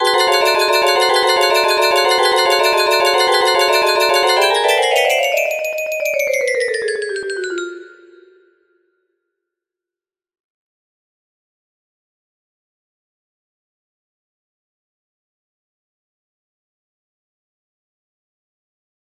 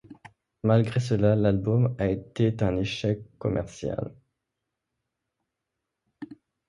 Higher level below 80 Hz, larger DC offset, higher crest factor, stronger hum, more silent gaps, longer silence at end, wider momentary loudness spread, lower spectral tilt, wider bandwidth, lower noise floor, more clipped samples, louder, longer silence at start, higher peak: second, -62 dBFS vs -50 dBFS; neither; about the same, 18 dB vs 20 dB; neither; neither; first, 11.1 s vs 0.35 s; second, 9 LU vs 16 LU; second, 0 dB/octave vs -8 dB/octave; first, 15.5 kHz vs 10.5 kHz; first, -90 dBFS vs -84 dBFS; neither; first, -14 LUFS vs -26 LUFS; about the same, 0 s vs 0.1 s; first, 0 dBFS vs -8 dBFS